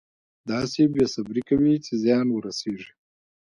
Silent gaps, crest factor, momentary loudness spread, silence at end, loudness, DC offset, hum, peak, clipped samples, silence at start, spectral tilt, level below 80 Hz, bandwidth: none; 16 dB; 11 LU; 0.75 s; -24 LUFS; under 0.1%; none; -8 dBFS; under 0.1%; 0.45 s; -6 dB/octave; -56 dBFS; 11 kHz